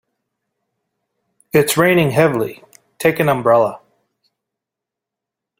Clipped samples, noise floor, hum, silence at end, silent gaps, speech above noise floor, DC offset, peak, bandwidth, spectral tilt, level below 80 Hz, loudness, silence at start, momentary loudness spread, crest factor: under 0.1%; -84 dBFS; none; 1.8 s; none; 70 dB; under 0.1%; 0 dBFS; 16.5 kHz; -5 dB/octave; -56 dBFS; -15 LUFS; 1.55 s; 8 LU; 18 dB